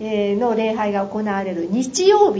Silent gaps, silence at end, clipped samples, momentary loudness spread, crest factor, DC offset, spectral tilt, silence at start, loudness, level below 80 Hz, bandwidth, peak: none; 0 s; under 0.1%; 7 LU; 16 dB; under 0.1%; -4.5 dB/octave; 0 s; -19 LUFS; -56 dBFS; 8 kHz; -2 dBFS